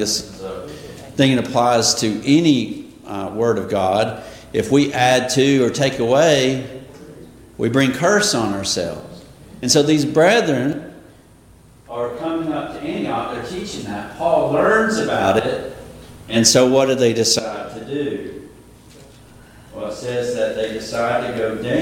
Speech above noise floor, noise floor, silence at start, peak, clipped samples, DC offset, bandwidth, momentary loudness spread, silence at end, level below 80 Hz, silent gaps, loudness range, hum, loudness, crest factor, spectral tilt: 31 dB; -47 dBFS; 0 s; 0 dBFS; under 0.1%; under 0.1%; 16.5 kHz; 17 LU; 0 s; -50 dBFS; none; 8 LU; none; -18 LUFS; 18 dB; -4 dB/octave